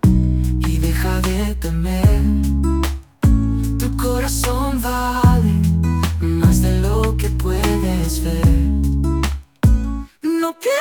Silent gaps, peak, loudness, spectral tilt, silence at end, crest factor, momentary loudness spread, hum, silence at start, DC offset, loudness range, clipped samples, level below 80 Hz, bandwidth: none; -2 dBFS; -18 LUFS; -6.5 dB/octave; 0 s; 14 dB; 6 LU; none; 0.05 s; under 0.1%; 2 LU; under 0.1%; -20 dBFS; 19.5 kHz